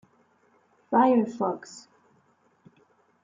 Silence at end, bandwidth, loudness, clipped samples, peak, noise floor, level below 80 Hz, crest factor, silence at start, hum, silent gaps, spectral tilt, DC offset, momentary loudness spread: 1.45 s; 7.6 kHz; -25 LUFS; under 0.1%; -10 dBFS; -65 dBFS; -82 dBFS; 20 dB; 0.9 s; none; none; -6.5 dB/octave; under 0.1%; 24 LU